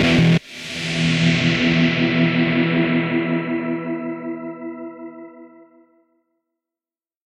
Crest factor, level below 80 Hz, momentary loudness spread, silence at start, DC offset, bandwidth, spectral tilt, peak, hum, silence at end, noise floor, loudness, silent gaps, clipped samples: 16 dB; -46 dBFS; 16 LU; 0 s; under 0.1%; 10.5 kHz; -6 dB/octave; -4 dBFS; none; 1.8 s; under -90 dBFS; -19 LUFS; none; under 0.1%